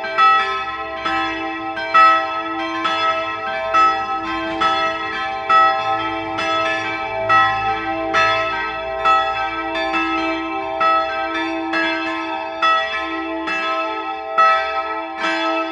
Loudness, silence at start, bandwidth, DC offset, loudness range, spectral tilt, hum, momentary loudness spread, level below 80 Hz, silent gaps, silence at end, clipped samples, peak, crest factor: -18 LUFS; 0 s; 9.8 kHz; under 0.1%; 3 LU; -3.5 dB/octave; none; 9 LU; -50 dBFS; none; 0 s; under 0.1%; -2 dBFS; 18 dB